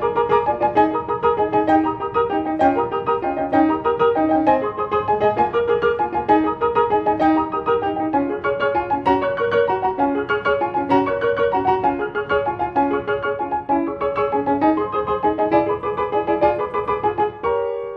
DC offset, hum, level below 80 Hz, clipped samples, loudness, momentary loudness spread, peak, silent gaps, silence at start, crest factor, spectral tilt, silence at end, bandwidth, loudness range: under 0.1%; none; -48 dBFS; under 0.1%; -19 LUFS; 4 LU; -4 dBFS; none; 0 s; 16 dB; -8 dB/octave; 0 s; 6 kHz; 2 LU